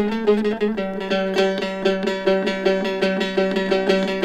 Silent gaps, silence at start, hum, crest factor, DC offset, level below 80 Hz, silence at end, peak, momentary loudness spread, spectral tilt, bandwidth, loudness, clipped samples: none; 0 s; none; 14 dB; under 0.1%; -52 dBFS; 0 s; -6 dBFS; 3 LU; -6 dB/octave; 11.5 kHz; -21 LUFS; under 0.1%